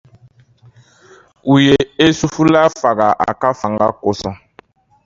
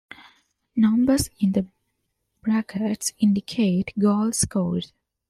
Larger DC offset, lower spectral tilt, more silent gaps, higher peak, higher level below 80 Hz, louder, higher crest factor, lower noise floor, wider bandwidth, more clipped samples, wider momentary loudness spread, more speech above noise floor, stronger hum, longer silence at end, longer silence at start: neither; about the same, -5.5 dB/octave vs -5.5 dB/octave; neither; first, 0 dBFS vs -8 dBFS; about the same, -46 dBFS vs -50 dBFS; first, -14 LUFS vs -23 LUFS; about the same, 16 dB vs 16 dB; second, -48 dBFS vs -75 dBFS; second, 7.6 kHz vs 14.5 kHz; neither; about the same, 12 LU vs 10 LU; second, 35 dB vs 54 dB; neither; first, 0.7 s vs 0.45 s; first, 1.45 s vs 0.75 s